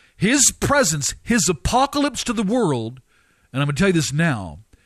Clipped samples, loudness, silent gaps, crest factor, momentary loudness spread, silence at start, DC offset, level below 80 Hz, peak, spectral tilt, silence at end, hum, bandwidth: under 0.1%; -19 LUFS; none; 18 dB; 11 LU; 0.2 s; under 0.1%; -40 dBFS; -2 dBFS; -3.5 dB/octave; 0.25 s; none; 14 kHz